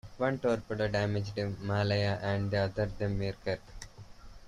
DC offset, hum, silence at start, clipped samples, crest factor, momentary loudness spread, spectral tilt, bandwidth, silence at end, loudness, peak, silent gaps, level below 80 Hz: under 0.1%; none; 0.05 s; under 0.1%; 16 dB; 8 LU; -7 dB/octave; 10.5 kHz; 0 s; -32 LUFS; -16 dBFS; none; -52 dBFS